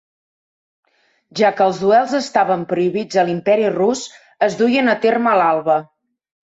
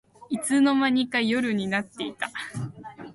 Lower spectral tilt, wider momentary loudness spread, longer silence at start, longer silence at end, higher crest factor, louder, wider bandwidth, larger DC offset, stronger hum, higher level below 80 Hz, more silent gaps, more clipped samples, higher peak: about the same, -5 dB/octave vs -4.5 dB/octave; second, 6 LU vs 14 LU; first, 1.35 s vs 0.3 s; first, 0.75 s vs 0 s; about the same, 14 dB vs 16 dB; first, -16 LUFS vs -25 LUFS; second, 8 kHz vs 11.5 kHz; neither; neither; about the same, -64 dBFS vs -66 dBFS; neither; neither; first, -2 dBFS vs -10 dBFS